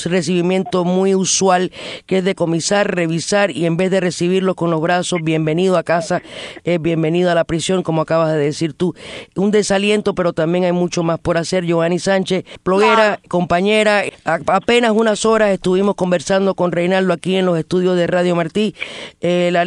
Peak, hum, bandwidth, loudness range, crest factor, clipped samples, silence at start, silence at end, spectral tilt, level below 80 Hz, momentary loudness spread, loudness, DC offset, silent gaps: 0 dBFS; none; 11 kHz; 2 LU; 16 dB; under 0.1%; 0 s; 0 s; -5 dB/octave; -50 dBFS; 6 LU; -16 LUFS; under 0.1%; none